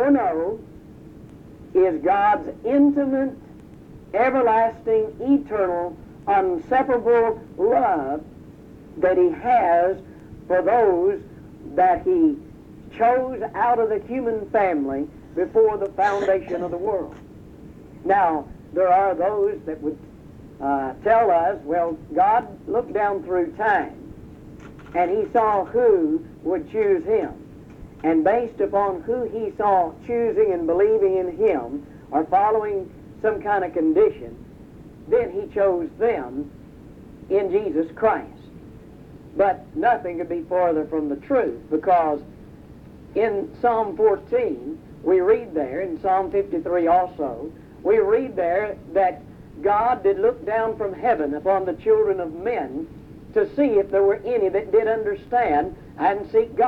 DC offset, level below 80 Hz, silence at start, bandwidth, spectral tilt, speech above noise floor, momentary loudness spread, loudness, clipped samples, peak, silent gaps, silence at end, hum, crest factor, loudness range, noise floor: under 0.1%; -50 dBFS; 0 s; 7 kHz; -8 dB/octave; 22 dB; 11 LU; -21 LUFS; under 0.1%; -6 dBFS; none; 0 s; none; 16 dB; 3 LU; -43 dBFS